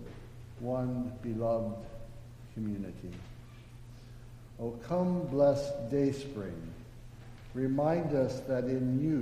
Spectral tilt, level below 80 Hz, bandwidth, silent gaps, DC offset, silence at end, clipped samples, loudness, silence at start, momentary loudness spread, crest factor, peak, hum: -8.5 dB/octave; -52 dBFS; 15 kHz; none; under 0.1%; 0 s; under 0.1%; -33 LUFS; 0 s; 22 LU; 18 dB; -16 dBFS; none